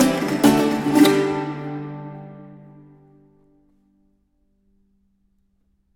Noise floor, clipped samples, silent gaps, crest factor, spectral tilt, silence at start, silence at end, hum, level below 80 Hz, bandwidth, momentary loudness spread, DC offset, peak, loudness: -65 dBFS; under 0.1%; none; 20 dB; -5 dB/octave; 0 s; 3.4 s; none; -54 dBFS; 19 kHz; 23 LU; under 0.1%; -2 dBFS; -19 LUFS